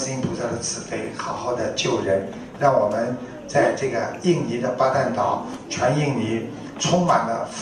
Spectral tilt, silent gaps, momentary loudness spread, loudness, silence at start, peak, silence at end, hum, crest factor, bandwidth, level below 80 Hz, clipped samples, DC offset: -5 dB/octave; none; 9 LU; -23 LUFS; 0 s; -4 dBFS; 0 s; none; 18 dB; 11 kHz; -54 dBFS; under 0.1%; under 0.1%